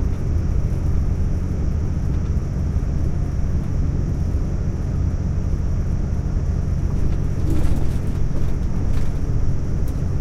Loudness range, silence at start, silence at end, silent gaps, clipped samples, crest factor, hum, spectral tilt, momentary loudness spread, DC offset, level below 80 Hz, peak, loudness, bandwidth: 0 LU; 0 s; 0 s; none; under 0.1%; 12 dB; none; -8.5 dB/octave; 2 LU; under 0.1%; -22 dBFS; -6 dBFS; -23 LUFS; 7.6 kHz